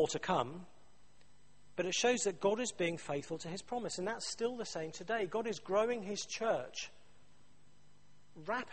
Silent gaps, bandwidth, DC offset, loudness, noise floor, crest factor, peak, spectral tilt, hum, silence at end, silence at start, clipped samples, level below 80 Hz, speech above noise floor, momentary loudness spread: none; 8.4 kHz; 0.2%; -37 LUFS; -68 dBFS; 20 dB; -18 dBFS; -3.5 dB/octave; 50 Hz at -70 dBFS; 0 s; 0 s; under 0.1%; -70 dBFS; 31 dB; 10 LU